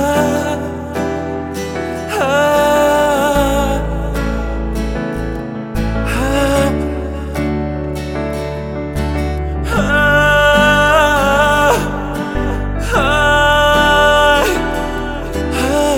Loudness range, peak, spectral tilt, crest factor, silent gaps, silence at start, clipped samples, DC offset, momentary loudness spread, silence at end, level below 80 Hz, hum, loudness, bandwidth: 6 LU; 0 dBFS; -4.5 dB/octave; 14 dB; none; 0 s; under 0.1%; under 0.1%; 12 LU; 0 s; -24 dBFS; none; -15 LUFS; 18 kHz